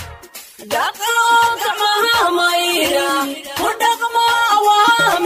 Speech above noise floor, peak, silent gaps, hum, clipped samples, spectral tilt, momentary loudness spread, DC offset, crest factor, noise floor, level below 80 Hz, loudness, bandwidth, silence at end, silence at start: 19 dB; -2 dBFS; none; none; under 0.1%; -1.5 dB/octave; 11 LU; under 0.1%; 12 dB; -37 dBFS; -52 dBFS; -15 LUFS; 16 kHz; 0 s; 0 s